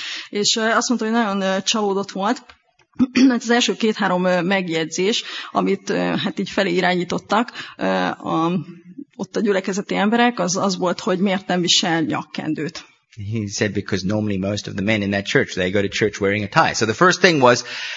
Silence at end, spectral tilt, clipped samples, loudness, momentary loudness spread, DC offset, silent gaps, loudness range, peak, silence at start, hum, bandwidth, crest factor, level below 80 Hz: 0 s; -4 dB/octave; under 0.1%; -19 LUFS; 10 LU; under 0.1%; none; 3 LU; 0 dBFS; 0 s; none; 8 kHz; 20 dB; -58 dBFS